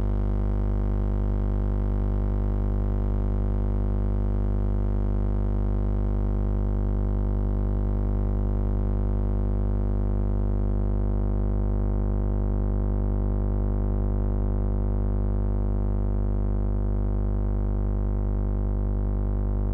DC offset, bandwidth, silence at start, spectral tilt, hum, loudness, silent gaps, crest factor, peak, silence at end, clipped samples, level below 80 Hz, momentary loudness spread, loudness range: under 0.1%; 2.3 kHz; 0 s; -11.5 dB/octave; 50 Hz at -25 dBFS; -27 LUFS; none; 6 dB; -18 dBFS; 0 s; under 0.1%; -26 dBFS; 1 LU; 0 LU